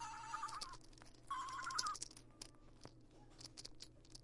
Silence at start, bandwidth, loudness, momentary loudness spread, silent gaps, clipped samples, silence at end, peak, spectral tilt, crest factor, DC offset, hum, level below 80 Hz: 0 s; 11.5 kHz; -48 LUFS; 20 LU; none; under 0.1%; 0 s; -20 dBFS; -1 dB/octave; 30 dB; under 0.1%; none; -66 dBFS